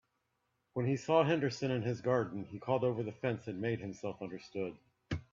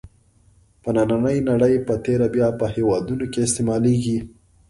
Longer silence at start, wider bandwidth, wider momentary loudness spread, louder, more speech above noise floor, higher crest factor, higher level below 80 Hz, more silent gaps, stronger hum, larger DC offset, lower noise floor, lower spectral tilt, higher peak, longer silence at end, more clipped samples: first, 0.75 s vs 0.05 s; second, 7.6 kHz vs 11.5 kHz; first, 13 LU vs 6 LU; second, -36 LUFS vs -20 LUFS; first, 47 dB vs 36 dB; first, 20 dB vs 14 dB; second, -66 dBFS vs -46 dBFS; neither; neither; neither; first, -81 dBFS vs -56 dBFS; about the same, -7 dB/octave vs -6.5 dB/octave; second, -16 dBFS vs -6 dBFS; second, 0.1 s vs 0.4 s; neither